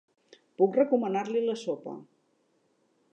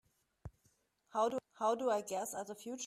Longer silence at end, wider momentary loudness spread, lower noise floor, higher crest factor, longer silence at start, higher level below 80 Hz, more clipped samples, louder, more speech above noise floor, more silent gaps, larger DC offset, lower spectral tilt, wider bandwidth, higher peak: first, 1.1 s vs 0 s; second, 15 LU vs 21 LU; second, -71 dBFS vs -76 dBFS; about the same, 18 dB vs 18 dB; first, 0.6 s vs 0.45 s; second, -88 dBFS vs -68 dBFS; neither; first, -28 LUFS vs -38 LUFS; first, 43 dB vs 39 dB; neither; neither; first, -6.5 dB/octave vs -3.5 dB/octave; second, 8.8 kHz vs 15.5 kHz; first, -12 dBFS vs -22 dBFS